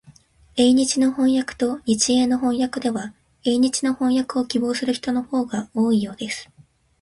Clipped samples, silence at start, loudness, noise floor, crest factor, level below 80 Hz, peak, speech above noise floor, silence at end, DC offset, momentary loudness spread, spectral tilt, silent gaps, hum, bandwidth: under 0.1%; 0.55 s; -21 LUFS; -51 dBFS; 16 dB; -56 dBFS; -4 dBFS; 31 dB; 0.6 s; under 0.1%; 10 LU; -3.5 dB/octave; none; none; 11.5 kHz